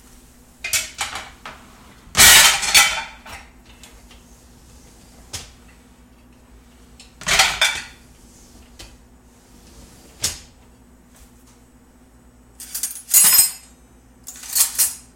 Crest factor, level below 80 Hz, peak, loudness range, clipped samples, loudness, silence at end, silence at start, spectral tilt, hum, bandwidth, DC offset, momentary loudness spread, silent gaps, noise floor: 22 dB; -46 dBFS; 0 dBFS; 19 LU; under 0.1%; -14 LUFS; 0.2 s; 0.65 s; 1 dB/octave; none; 17 kHz; under 0.1%; 28 LU; none; -50 dBFS